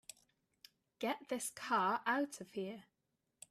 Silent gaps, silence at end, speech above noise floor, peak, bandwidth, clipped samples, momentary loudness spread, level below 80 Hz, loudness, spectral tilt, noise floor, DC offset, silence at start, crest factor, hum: none; 0.7 s; 47 dB; -24 dBFS; 15 kHz; under 0.1%; 19 LU; -86 dBFS; -39 LUFS; -3 dB/octave; -86 dBFS; under 0.1%; 1 s; 18 dB; none